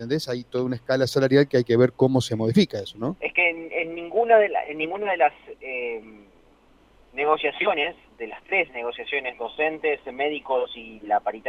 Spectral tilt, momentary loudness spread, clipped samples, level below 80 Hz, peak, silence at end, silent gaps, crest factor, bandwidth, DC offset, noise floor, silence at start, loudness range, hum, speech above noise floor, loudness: -6 dB/octave; 12 LU; under 0.1%; -60 dBFS; -4 dBFS; 0 s; none; 20 dB; 15.5 kHz; under 0.1%; -56 dBFS; 0 s; 5 LU; none; 33 dB; -23 LUFS